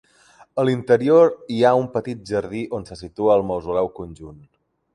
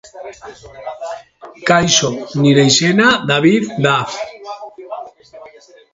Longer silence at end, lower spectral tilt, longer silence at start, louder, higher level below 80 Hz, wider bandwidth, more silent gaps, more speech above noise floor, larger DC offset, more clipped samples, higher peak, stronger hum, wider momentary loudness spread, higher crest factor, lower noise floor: first, 0.6 s vs 0.45 s; first, -7 dB/octave vs -4 dB/octave; first, 0.55 s vs 0.15 s; second, -20 LUFS vs -13 LUFS; about the same, -52 dBFS vs -52 dBFS; first, 10.5 kHz vs 8 kHz; neither; first, 33 dB vs 28 dB; neither; neither; second, -4 dBFS vs 0 dBFS; neither; second, 16 LU vs 22 LU; about the same, 18 dB vs 16 dB; first, -53 dBFS vs -42 dBFS